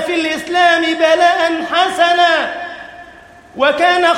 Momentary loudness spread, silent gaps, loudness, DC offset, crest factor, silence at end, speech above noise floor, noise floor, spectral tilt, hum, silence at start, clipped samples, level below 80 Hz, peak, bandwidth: 13 LU; none; -13 LUFS; under 0.1%; 14 dB; 0 s; 27 dB; -40 dBFS; -2 dB/octave; none; 0 s; under 0.1%; -56 dBFS; 0 dBFS; 14 kHz